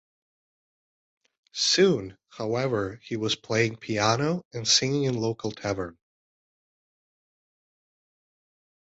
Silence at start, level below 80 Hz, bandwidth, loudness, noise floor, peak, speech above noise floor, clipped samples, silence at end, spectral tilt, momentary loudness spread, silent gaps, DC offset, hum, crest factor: 1.55 s; -60 dBFS; 8.2 kHz; -25 LUFS; under -90 dBFS; -8 dBFS; over 64 dB; under 0.1%; 2.9 s; -3.5 dB/octave; 12 LU; 4.45-4.51 s; under 0.1%; none; 20 dB